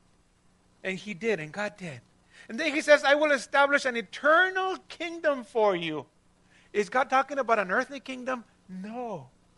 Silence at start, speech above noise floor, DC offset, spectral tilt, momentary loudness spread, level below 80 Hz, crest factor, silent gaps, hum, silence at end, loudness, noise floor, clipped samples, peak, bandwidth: 0.85 s; 37 dB; under 0.1%; -4 dB/octave; 17 LU; -70 dBFS; 24 dB; none; 60 Hz at -65 dBFS; 0.3 s; -27 LUFS; -64 dBFS; under 0.1%; -4 dBFS; 11.5 kHz